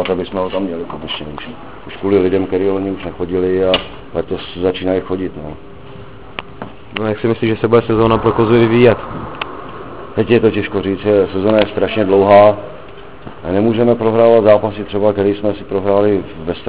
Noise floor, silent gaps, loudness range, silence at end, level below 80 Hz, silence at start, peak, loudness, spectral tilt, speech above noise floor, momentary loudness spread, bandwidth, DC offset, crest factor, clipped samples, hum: -35 dBFS; none; 7 LU; 0 s; -40 dBFS; 0 s; 0 dBFS; -14 LUFS; -11 dB/octave; 21 dB; 20 LU; 4 kHz; 2%; 14 dB; 0.1%; none